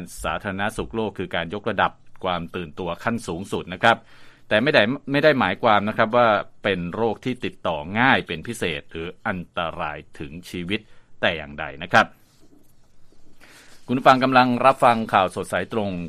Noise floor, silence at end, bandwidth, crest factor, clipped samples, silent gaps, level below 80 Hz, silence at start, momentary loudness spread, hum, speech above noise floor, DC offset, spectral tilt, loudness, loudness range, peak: -49 dBFS; 0 s; 14.5 kHz; 22 dB; under 0.1%; none; -50 dBFS; 0 s; 13 LU; none; 27 dB; under 0.1%; -5.5 dB/octave; -22 LUFS; 7 LU; 0 dBFS